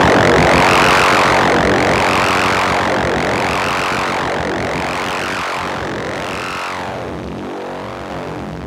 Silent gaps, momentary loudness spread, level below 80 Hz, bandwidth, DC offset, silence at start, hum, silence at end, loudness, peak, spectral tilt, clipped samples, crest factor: none; 15 LU; -34 dBFS; 17 kHz; under 0.1%; 0 s; none; 0 s; -14 LUFS; 0 dBFS; -4 dB/octave; under 0.1%; 14 dB